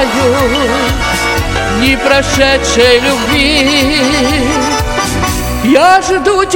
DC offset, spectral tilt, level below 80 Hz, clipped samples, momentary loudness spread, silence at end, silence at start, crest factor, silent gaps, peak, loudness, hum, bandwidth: under 0.1%; -3.5 dB/octave; -22 dBFS; 0.8%; 6 LU; 0 s; 0 s; 10 dB; none; 0 dBFS; -10 LUFS; none; 18 kHz